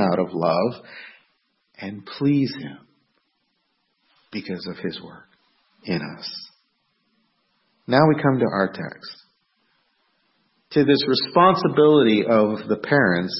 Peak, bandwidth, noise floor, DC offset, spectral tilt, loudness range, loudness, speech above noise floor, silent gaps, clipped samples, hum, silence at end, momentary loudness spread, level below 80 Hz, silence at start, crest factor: -2 dBFS; 6 kHz; -71 dBFS; under 0.1%; -9.5 dB/octave; 15 LU; -20 LUFS; 51 dB; none; under 0.1%; none; 0 s; 21 LU; -66 dBFS; 0 s; 20 dB